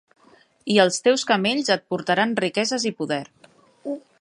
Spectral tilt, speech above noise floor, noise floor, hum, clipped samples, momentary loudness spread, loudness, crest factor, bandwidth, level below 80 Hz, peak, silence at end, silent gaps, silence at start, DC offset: -3.5 dB/octave; 35 dB; -56 dBFS; none; under 0.1%; 15 LU; -21 LUFS; 20 dB; 11.5 kHz; -70 dBFS; -4 dBFS; 0.2 s; none; 0.65 s; under 0.1%